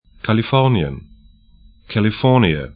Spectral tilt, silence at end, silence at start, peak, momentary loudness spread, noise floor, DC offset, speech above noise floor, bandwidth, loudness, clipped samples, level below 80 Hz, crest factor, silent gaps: -10.5 dB/octave; 0.05 s; 0.25 s; 0 dBFS; 11 LU; -48 dBFS; under 0.1%; 32 dB; 5 kHz; -17 LUFS; under 0.1%; -40 dBFS; 18 dB; none